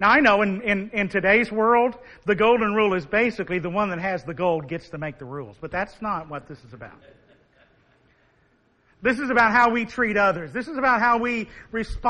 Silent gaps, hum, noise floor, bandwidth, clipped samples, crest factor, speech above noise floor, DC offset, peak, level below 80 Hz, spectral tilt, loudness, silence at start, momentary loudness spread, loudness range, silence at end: none; none; -63 dBFS; 10 kHz; under 0.1%; 18 dB; 40 dB; under 0.1%; -4 dBFS; -48 dBFS; -6 dB/octave; -22 LUFS; 0 s; 15 LU; 13 LU; 0 s